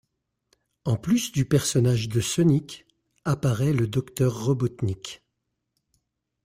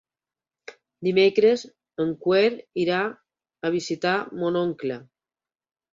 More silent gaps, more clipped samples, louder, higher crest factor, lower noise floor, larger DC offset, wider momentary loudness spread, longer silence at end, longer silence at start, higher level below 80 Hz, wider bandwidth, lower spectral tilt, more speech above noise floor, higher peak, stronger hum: neither; neither; about the same, -24 LUFS vs -24 LUFS; about the same, 18 dB vs 18 dB; second, -80 dBFS vs under -90 dBFS; neither; about the same, 13 LU vs 12 LU; first, 1.3 s vs 0.9 s; first, 0.85 s vs 0.7 s; first, -54 dBFS vs -68 dBFS; first, 16 kHz vs 7.6 kHz; about the same, -6 dB/octave vs -5.5 dB/octave; second, 56 dB vs over 67 dB; about the same, -8 dBFS vs -8 dBFS; neither